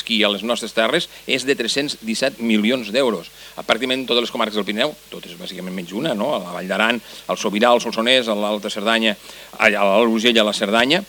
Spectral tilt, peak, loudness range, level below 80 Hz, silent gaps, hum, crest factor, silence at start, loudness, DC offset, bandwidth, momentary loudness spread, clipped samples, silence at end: -3.5 dB/octave; 0 dBFS; 5 LU; -60 dBFS; none; none; 20 dB; 0 s; -19 LUFS; under 0.1%; 19 kHz; 13 LU; under 0.1%; 0.05 s